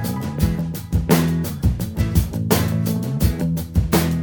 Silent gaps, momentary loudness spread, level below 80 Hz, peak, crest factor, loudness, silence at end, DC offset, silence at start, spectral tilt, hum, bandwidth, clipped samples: none; 6 LU; -28 dBFS; -2 dBFS; 18 dB; -21 LUFS; 0 s; under 0.1%; 0 s; -6 dB/octave; none; over 20 kHz; under 0.1%